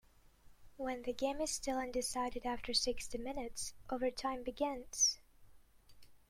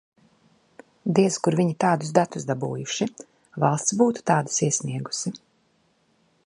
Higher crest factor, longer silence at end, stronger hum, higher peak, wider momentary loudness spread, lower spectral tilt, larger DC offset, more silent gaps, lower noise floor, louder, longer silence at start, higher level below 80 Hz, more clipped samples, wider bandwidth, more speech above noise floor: about the same, 20 dB vs 22 dB; second, 0.15 s vs 1.1 s; neither; second, -20 dBFS vs -4 dBFS; about the same, 11 LU vs 9 LU; second, -1 dB/octave vs -5 dB/octave; neither; neither; second, -62 dBFS vs -66 dBFS; second, -38 LUFS vs -24 LUFS; second, 0.45 s vs 1.05 s; first, -58 dBFS vs -68 dBFS; neither; first, 16.5 kHz vs 11.5 kHz; second, 24 dB vs 43 dB